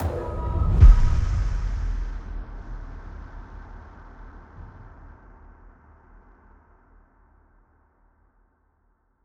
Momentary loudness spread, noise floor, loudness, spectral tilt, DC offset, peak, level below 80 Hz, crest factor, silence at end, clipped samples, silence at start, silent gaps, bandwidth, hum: 29 LU; -67 dBFS; -23 LUFS; -8 dB/octave; under 0.1%; -2 dBFS; -26 dBFS; 22 dB; 4.4 s; under 0.1%; 0 s; none; 6.8 kHz; none